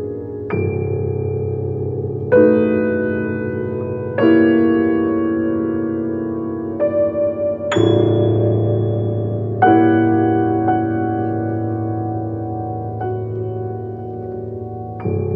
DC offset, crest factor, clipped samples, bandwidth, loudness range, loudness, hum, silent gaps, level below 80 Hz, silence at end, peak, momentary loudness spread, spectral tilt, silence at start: under 0.1%; 16 dB; under 0.1%; 7.4 kHz; 7 LU; -18 LUFS; none; none; -50 dBFS; 0 s; 0 dBFS; 12 LU; -9 dB/octave; 0 s